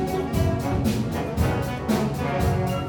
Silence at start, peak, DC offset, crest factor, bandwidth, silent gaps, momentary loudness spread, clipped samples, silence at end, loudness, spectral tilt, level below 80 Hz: 0 s; -10 dBFS; under 0.1%; 14 dB; 19 kHz; none; 2 LU; under 0.1%; 0 s; -24 LUFS; -6.5 dB/octave; -34 dBFS